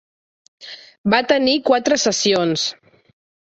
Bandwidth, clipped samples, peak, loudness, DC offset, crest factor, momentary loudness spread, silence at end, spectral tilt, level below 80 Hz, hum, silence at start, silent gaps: 8.2 kHz; under 0.1%; -2 dBFS; -17 LUFS; under 0.1%; 18 dB; 18 LU; 0.85 s; -3 dB/octave; -58 dBFS; none; 0.6 s; 0.98-1.04 s